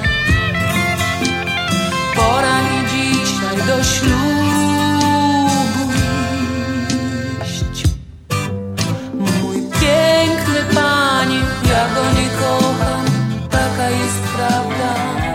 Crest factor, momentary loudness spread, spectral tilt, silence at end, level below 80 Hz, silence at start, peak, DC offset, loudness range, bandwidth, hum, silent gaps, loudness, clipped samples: 16 dB; 7 LU; -4.5 dB/octave; 0 s; -30 dBFS; 0 s; 0 dBFS; under 0.1%; 5 LU; 16.5 kHz; none; none; -16 LUFS; under 0.1%